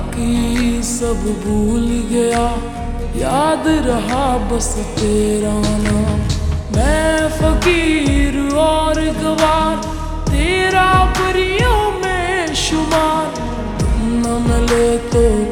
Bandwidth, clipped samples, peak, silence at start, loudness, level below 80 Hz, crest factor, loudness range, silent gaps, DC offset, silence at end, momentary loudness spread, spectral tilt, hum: 19 kHz; under 0.1%; -2 dBFS; 0 s; -16 LUFS; -22 dBFS; 14 dB; 2 LU; none; under 0.1%; 0 s; 6 LU; -5 dB/octave; none